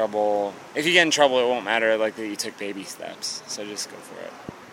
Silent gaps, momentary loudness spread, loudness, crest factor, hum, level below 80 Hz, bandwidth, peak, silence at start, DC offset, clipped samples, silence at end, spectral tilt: none; 19 LU; -23 LUFS; 22 dB; none; -72 dBFS; 16.5 kHz; -2 dBFS; 0 s; under 0.1%; under 0.1%; 0 s; -2 dB/octave